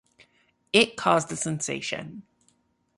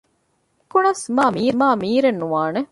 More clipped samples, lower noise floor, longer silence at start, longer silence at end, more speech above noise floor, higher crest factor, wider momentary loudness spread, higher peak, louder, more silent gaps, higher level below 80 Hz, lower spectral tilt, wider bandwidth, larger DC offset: neither; about the same, -68 dBFS vs -66 dBFS; about the same, 0.75 s vs 0.75 s; first, 0.75 s vs 0.05 s; second, 43 dB vs 48 dB; first, 24 dB vs 16 dB; first, 12 LU vs 4 LU; about the same, -4 dBFS vs -4 dBFS; second, -25 LUFS vs -19 LUFS; neither; about the same, -66 dBFS vs -62 dBFS; second, -3 dB/octave vs -5 dB/octave; about the same, 11.5 kHz vs 11.5 kHz; neither